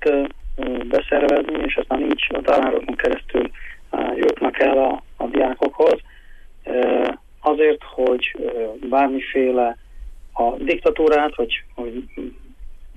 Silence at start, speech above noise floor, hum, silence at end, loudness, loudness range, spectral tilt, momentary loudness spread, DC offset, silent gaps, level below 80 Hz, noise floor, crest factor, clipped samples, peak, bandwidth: 0 s; 22 dB; none; 0.05 s; -20 LUFS; 1 LU; -5.5 dB/octave; 12 LU; under 0.1%; none; -38 dBFS; -41 dBFS; 14 dB; under 0.1%; -6 dBFS; 8.2 kHz